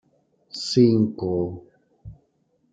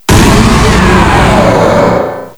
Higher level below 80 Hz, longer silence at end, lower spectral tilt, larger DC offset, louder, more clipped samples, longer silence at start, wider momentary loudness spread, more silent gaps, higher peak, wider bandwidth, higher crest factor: second, -58 dBFS vs -14 dBFS; first, 0.6 s vs 0.05 s; first, -7 dB/octave vs -5.5 dB/octave; neither; second, -22 LUFS vs -6 LUFS; second, under 0.1% vs 4%; first, 0.55 s vs 0.1 s; first, 18 LU vs 3 LU; neither; second, -6 dBFS vs 0 dBFS; second, 9.2 kHz vs over 20 kHz; first, 20 dB vs 6 dB